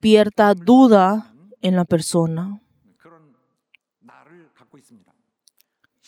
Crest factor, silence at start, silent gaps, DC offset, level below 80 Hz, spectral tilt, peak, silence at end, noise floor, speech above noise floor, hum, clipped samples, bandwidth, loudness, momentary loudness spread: 18 dB; 0.05 s; none; under 0.1%; -60 dBFS; -6 dB/octave; 0 dBFS; 3.5 s; -65 dBFS; 50 dB; none; under 0.1%; 14.5 kHz; -16 LUFS; 16 LU